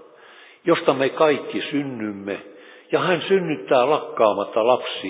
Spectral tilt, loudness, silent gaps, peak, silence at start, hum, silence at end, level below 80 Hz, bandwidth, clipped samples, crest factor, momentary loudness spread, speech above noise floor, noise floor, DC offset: -9.5 dB/octave; -21 LUFS; none; -2 dBFS; 0.65 s; none; 0 s; -70 dBFS; 4 kHz; under 0.1%; 18 dB; 10 LU; 27 dB; -48 dBFS; under 0.1%